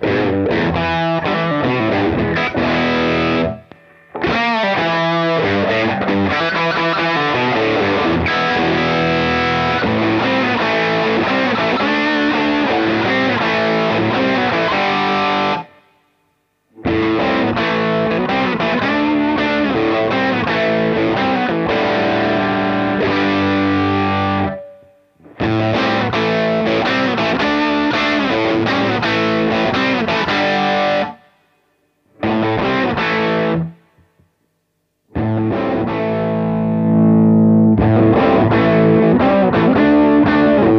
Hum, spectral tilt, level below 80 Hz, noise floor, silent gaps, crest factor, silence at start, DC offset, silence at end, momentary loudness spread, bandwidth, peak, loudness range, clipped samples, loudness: none; -7 dB/octave; -42 dBFS; -68 dBFS; none; 14 dB; 0 s; under 0.1%; 0 s; 6 LU; 7.2 kHz; -2 dBFS; 5 LU; under 0.1%; -15 LUFS